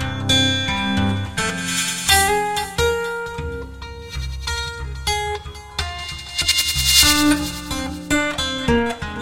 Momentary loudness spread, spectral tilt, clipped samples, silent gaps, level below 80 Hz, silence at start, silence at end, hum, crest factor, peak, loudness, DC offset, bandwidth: 15 LU; -2.5 dB/octave; under 0.1%; none; -34 dBFS; 0 s; 0 s; none; 20 dB; -2 dBFS; -19 LUFS; 0.3%; 16.5 kHz